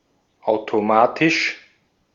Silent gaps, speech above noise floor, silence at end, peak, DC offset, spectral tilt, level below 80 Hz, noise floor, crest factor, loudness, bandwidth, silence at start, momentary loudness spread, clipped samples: none; 42 dB; 0.55 s; -2 dBFS; under 0.1%; -4.5 dB/octave; -66 dBFS; -60 dBFS; 20 dB; -19 LUFS; 7.4 kHz; 0.45 s; 11 LU; under 0.1%